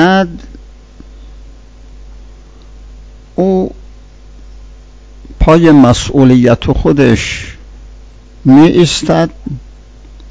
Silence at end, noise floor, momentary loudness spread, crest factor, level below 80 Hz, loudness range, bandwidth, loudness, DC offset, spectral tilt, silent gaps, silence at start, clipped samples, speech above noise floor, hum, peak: 0 s; -34 dBFS; 18 LU; 12 dB; -26 dBFS; 11 LU; 8 kHz; -9 LUFS; under 0.1%; -6.5 dB/octave; none; 0 s; 3%; 27 dB; none; 0 dBFS